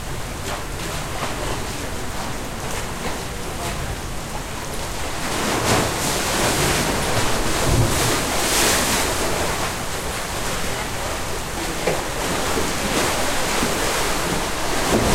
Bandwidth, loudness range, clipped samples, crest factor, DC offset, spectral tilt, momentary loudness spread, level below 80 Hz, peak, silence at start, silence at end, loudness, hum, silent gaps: 16 kHz; 8 LU; under 0.1%; 16 dB; under 0.1%; -3 dB/octave; 9 LU; -32 dBFS; -6 dBFS; 0 s; 0 s; -22 LUFS; none; none